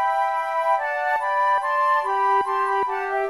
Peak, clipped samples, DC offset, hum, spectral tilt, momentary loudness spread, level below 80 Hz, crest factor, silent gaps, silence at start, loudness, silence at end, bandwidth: -10 dBFS; under 0.1%; 0.1%; none; -2.5 dB/octave; 3 LU; -64 dBFS; 12 dB; none; 0 s; -21 LUFS; 0 s; 12.5 kHz